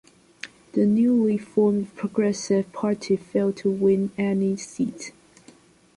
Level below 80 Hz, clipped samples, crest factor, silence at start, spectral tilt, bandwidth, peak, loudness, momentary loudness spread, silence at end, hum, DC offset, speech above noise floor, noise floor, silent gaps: -64 dBFS; under 0.1%; 14 dB; 0.45 s; -6.5 dB/octave; 11.5 kHz; -10 dBFS; -23 LUFS; 11 LU; 0.85 s; none; under 0.1%; 31 dB; -53 dBFS; none